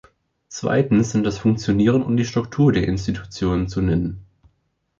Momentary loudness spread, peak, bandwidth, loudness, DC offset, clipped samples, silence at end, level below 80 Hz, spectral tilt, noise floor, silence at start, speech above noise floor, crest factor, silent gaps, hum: 10 LU; -4 dBFS; 7.8 kHz; -20 LUFS; under 0.1%; under 0.1%; 0.75 s; -40 dBFS; -7 dB/octave; -68 dBFS; 0.5 s; 49 dB; 16 dB; none; none